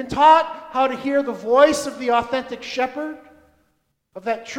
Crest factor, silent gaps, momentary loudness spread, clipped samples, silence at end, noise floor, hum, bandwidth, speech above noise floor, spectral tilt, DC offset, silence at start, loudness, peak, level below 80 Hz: 20 dB; none; 14 LU; under 0.1%; 0 s; -68 dBFS; none; 16.5 kHz; 49 dB; -3.5 dB/octave; under 0.1%; 0 s; -19 LUFS; 0 dBFS; -54 dBFS